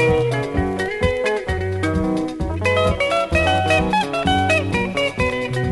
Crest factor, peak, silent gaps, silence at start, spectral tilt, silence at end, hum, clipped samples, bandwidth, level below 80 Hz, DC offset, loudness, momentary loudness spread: 16 dB; -4 dBFS; none; 0 s; -5.5 dB/octave; 0 s; none; under 0.1%; 11.5 kHz; -32 dBFS; under 0.1%; -19 LUFS; 5 LU